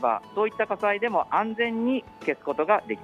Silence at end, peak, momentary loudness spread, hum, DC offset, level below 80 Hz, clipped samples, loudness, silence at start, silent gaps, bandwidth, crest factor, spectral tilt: 0 s; -10 dBFS; 5 LU; none; under 0.1%; -66 dBFS; under 0.1%; -26 LUFS; 0 s; none; 10 kHz; 16 dB; -6.5 dB/octave